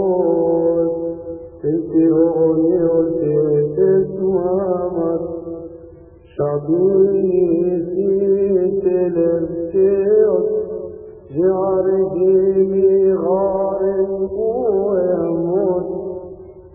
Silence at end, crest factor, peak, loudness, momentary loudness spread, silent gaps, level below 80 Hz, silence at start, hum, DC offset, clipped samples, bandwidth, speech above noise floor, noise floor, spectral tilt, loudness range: 0.05 s; 12 dB; -4 dBFS; -17 LUFS; 12 LU; none; -48 dBFS; 0 s; none; under 0.1%; under 0.1%; 2.7 kHz; 26 dB; -42 dBFS; -15 dB/octave; 3 LU